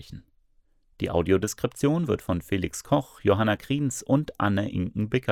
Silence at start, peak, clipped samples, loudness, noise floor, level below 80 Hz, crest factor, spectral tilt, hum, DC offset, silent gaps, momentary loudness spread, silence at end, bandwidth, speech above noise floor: 0 s; -8 dBFS; under 0.1%; -26 LUFS; -63 dBFS; -52 dBFS; 18 dB; -6 dB/octave; none; under 0.1%; none; 6 LU; 0 s; 17 kHz; 38 dB